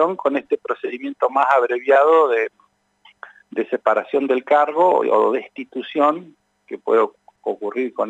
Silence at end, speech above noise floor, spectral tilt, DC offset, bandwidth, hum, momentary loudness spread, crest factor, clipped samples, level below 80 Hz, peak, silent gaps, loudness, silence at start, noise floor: 0 s; 36 dB; -6 dB/octave; under 0.1%; 8 kHz; none; 14 LU; 16 dB; under 0.1%; -80 dBFS; -2 dBFS; none; -19 LUFS; 0 s; -55 dBFS